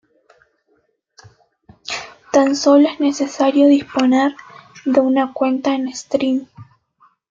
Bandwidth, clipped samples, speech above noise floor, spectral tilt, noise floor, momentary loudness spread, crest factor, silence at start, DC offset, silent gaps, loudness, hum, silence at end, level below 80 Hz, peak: 7.6 kHz; under 0.1%; 48 dB; -4 dB/octave; -63 dBFS; 14 LU; 16 dB; 1.9 s; under 0.1%; none; -17 LUFS; none; 0.7 s; -64 dBFS; -2 dBFS